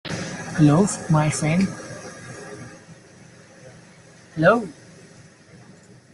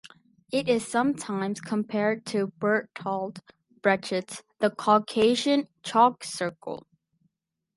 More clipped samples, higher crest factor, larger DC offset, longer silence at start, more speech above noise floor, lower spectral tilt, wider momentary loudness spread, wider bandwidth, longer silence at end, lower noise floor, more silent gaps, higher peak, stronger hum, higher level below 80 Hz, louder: neither; about the same, 22 dB vs 20 dB; neither; about the same, 0.05 s vs 0.05 s; second, 30 dB vs 53 dB; first, -6 dB/octave vs -4.5 dB/octave; first, 20 LU vs 10 LU; about the same, 11.5 kHz vs 11.5 kHz; second, 0.6 s vs 0.95 s; second, -48 dBFS vs -79 dBFS; neither; first, -2 dBFS vs -8 dBFS; neither; first, -54 dBFS vs -70 dBFS; first, -20 LUFS vs -26 LUFS